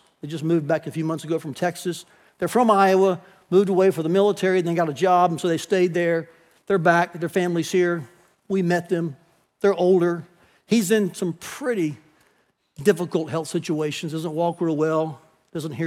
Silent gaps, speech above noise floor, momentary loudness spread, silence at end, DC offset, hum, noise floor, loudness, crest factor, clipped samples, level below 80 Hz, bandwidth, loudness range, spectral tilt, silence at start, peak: none; 44 dB; 11 LU; 0 s; under 0.1%; none; -65 dBFS; -22 LUFS; 18 dB; under 0.1%; -70 dBFS; 16 kHz; 5 LU; -6 dB/octave; 0.25 s; -4 dBFS